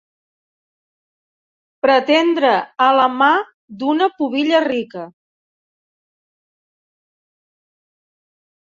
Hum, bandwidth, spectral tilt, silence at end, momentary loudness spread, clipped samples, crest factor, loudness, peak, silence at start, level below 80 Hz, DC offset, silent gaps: none; 7.6 kHz; -4.5 dB/octave; 3.55 s; 14 LU; under 0.1%; 18 dB; -16 LUFS; -2 dBFS; 1.85 s; -68 dBFS; under 0.1%; 3.54-3.68 s